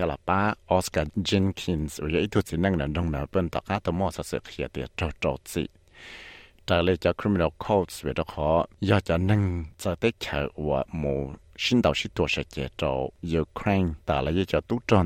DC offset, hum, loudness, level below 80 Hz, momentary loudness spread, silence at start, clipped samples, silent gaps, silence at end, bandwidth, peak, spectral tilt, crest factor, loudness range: under 0.1%; none; -27 LUFS; -44 dBFS; 9 LU; 0 s; under 0.1%; none; 0 s; 16 kHz; -8 dBFS; -6 dB/octave; 20 dB; 4 LU